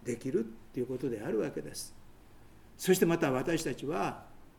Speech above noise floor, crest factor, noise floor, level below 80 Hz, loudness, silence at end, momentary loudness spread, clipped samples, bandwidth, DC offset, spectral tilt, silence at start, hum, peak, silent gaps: 22 dB; 20 dB; -54 dBFS; -58 dBFS; -33 LUFS; 0.1 s; 14 LU; under 0.1%; 19 kHz; under 0.1%; -5 dB/octave; 0 s; none; -12 dBFS; none